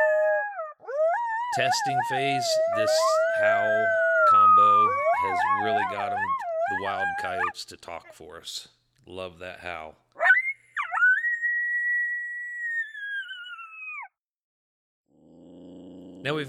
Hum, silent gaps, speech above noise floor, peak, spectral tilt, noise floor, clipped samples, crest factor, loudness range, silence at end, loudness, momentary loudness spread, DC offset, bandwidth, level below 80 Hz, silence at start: none; 14.18-15.04 s; 28 dB; -8 dBFS; -3 dB/octave; -52 dBFS; under 0.1%; 18 dB; 14 LU; 0 s; -23 LUFS; 18 LU; under 0.1%; 14.5 kHz; -72 dBFS; 0 s